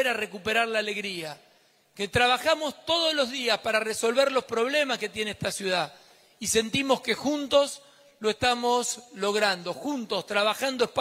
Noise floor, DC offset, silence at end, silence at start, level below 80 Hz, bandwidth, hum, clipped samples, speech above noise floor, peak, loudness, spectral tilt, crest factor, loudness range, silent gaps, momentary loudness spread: -60 dBFS; under 0.1%; 0 s; 0 s; -62 dBFS; 16 kHz; none; under 0.1%; 34 dB; -8 dBFS; -26 LUFS; -2.5 dB/octave; 20 dB; 2 LU; none; 8 LU